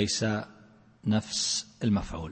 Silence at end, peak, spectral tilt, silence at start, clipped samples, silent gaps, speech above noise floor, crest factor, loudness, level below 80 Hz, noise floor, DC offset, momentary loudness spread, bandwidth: 0 s; -12 dBFS; -4 dB/octave; 0 s; under 0.1%; none; 27 dB; 18 dB; -29 LUFS; -50 dBFS; -56 dBFS; under 0.1%; 8 LU; 8.8 kHz